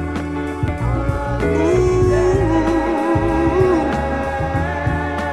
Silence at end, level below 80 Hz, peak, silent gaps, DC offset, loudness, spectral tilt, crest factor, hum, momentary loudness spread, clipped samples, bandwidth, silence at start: 0 s; -28 dBFS; -2 dBFS; none; under 0.1%; -18 LUFS; -7.5 dB/octave; 14 dB; none; 6 LU; under 0.1%; 12 kHz; 0 s